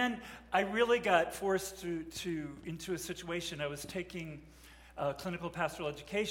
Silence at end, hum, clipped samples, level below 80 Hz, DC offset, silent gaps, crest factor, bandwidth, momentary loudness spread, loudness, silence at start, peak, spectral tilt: 0 s; none; under 0.1%; -60 dBFS; under 0.1%; none; 22 dB; 16.5 kHz; 13 LU; -36 LUFS; 0 s; -14 dBFS; -4 dB/octave